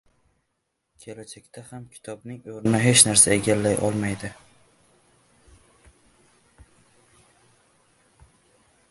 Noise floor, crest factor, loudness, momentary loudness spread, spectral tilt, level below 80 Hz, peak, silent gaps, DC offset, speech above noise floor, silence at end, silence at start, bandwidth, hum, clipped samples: -77 dBFS; 26 dB; -19 LUFS; 27 LU; -3 dB/octave; -56 dBFS; 0 dBFS; none; under 0.1%; 54 dB; 4.55 s; 1.05 s; 12 kHz; none; under 0.1%